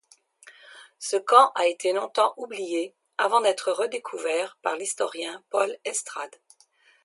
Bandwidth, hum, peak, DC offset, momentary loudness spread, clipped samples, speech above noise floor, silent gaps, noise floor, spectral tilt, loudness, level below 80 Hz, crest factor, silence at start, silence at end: 11.5 kHz; none; -2 dBFS; under 0.1%; 15 LU; under 0.1%; 36 dB; none; -61 dBFS; -0.5 dB/octave; -25 LUFS; -88 dBFS; 24 dB; 0.45 s; 0.75 s